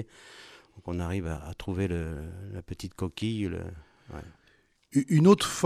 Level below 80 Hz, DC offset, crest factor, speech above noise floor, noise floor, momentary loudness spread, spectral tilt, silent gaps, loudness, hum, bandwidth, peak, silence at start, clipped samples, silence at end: -48 dBFS; under 0.1%; 22 dB; 37 dB; -65 dBFS; 25 LU; -6 dB/octave; none; -29 LUFS; none; 14.5 kHz; -8 dBFS; 0 s; under 0.1%; 0 s